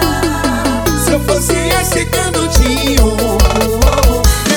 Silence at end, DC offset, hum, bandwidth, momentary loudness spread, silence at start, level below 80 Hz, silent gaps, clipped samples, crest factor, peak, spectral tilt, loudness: 0 s; under 0.1%; none; over 20 kHz; 3 LU; 0 s; -16 dBFS; none; under 0.1%; 12 dB; 0 dBFS; -4 dB/octave; -12 LUFS